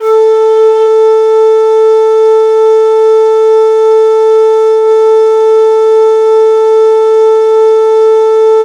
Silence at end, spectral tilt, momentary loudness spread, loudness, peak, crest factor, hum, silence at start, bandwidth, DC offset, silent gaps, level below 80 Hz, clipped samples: 0 s; -2 dB/octave; 0 LU; -6 LUFS; 0 dBFS; 6 dB; none; 0 s; 7.8 kHz; under 0.1%; none; -64 dBFS; under 0.1%